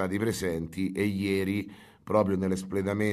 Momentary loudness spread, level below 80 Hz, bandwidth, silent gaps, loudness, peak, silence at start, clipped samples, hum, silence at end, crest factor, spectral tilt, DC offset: 6 LU; -58 dBFS; 14.5 kHz; none; -29 LUFS; -10 dBFS; 0 s; under 0.1%; none; 0 s; 18 dB; -6.5 dB/octave; under 0.1%